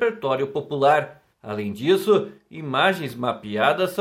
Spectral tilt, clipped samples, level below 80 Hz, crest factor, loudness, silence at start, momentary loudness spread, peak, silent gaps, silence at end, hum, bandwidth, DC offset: -5.5 dB/octave; under 0.1%; -68 dBFS; 18 dB; -22 LUFS; 0 s; 13 LU; -4 dBFS; none; 0 s; none; 16.5 kHz; under 0.1%